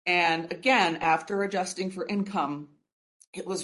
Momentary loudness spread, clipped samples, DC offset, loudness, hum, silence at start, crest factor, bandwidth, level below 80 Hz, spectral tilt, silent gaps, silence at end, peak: 13 LU; under 0.1%; under 0.1%; -27 LUFS; none; 0.05 s; 20 dB; 11.5 kHz; -70 dBFS; -4 dB/octave; 2.93-3.20 s, 3.27-3.33 s; 0 s; -8 dBFS